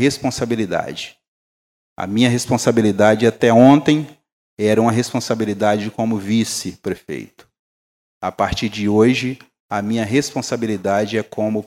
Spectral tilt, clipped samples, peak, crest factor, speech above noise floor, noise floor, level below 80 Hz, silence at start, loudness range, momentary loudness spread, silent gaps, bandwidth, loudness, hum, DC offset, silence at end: -5.5 dB/octave; under 0.1%; 0 dBFS; 18 dB; over 73 dB; under -90 dBFS; -50 dBFS; 0 s; 7 LU; 14 LU; 1.28-1.96 s, 4.32-4.57 s, 7.59-8.21 s, 9.60-9.69 s; 16 kHz; -18 LUFS; none; under 0.1%; 0 s